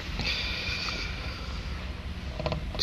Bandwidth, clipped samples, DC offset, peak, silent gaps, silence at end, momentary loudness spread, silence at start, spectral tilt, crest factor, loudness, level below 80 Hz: 13.5 kHz; under 0.1%; 0.1%; -10 dBFS; none; 0 s; 8 LU; 0 s; -4 dB/octave; 22 dB; -32 LUFS; -38 dBFS